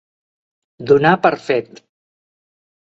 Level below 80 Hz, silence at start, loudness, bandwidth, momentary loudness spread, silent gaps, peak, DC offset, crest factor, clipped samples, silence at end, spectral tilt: -58 dBFS; 0.8 s; -15 LUFS; 7.8 kHz; 9 LU; none; 0 dBFS; under 0.1%; 20 dB; under 0.1%; 1.35 s; -7 dB/octave